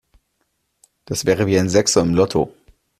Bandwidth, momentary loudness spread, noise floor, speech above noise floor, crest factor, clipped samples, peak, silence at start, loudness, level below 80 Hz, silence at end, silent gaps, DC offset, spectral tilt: 14.5 kHz; 9 LU; -70 dBFS; 53 dB; 18 dB; under 0.1%; -2 dBFS; 1.1 s; -18 LUFS; -48 dBFS; 0.5 s; none; under 0.1%; -4.5 dB/octave